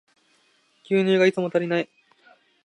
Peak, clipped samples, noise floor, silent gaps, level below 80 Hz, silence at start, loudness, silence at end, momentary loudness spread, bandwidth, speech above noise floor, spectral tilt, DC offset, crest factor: -8 dBFS; under 0.1%; -63 dBFS; none; -76 dBFS; 0.9 s; -22 LUFS; 0.8 s; 8 LU; 10 kHz; 43 dB; -6.5 dB/octave; under 0.1%; 18 dB